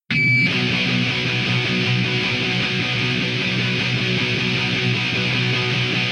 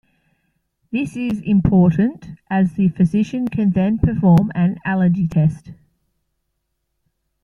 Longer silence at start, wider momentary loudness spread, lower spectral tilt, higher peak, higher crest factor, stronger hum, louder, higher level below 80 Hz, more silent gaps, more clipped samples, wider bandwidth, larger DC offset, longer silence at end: second, 0.1 s vs 0.9 s; second, 3 LU vs 9 LU; second, -5 dB/octave vs -9.5 dB/octave; second, -6 dBFS vs -2 dBFS; second, 12 dB vs 18 dB; neither; about the same, -18 LUFS vs -17 LUFS; second, -50 dBFS vs -42 dBFS; neither; neither; first, 10 kHz vs 6.8 kHz; neither; second, 0 s vs 1.7 s